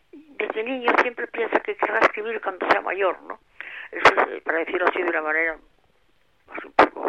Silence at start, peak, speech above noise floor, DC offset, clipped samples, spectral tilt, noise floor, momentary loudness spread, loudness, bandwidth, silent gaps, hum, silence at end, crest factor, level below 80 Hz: 0.15 s; -4 dBFS; 42 dB; under 0.1%; under 0.1%; -4 dB/octave; -65 dBFS; 18 LU; -22 LUFS; 11.5 kHz; none; none; 0 s; 20 dB; -60 dBFS